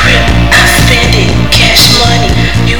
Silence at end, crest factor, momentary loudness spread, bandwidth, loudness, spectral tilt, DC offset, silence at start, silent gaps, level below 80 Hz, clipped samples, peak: 0 s; 8 dB; 5 LU; over 20 kHz; -5 LUFS; -3.5 dB/octave; 10%; 0 s; none; -14 dBFS; 5%; 0 dBFS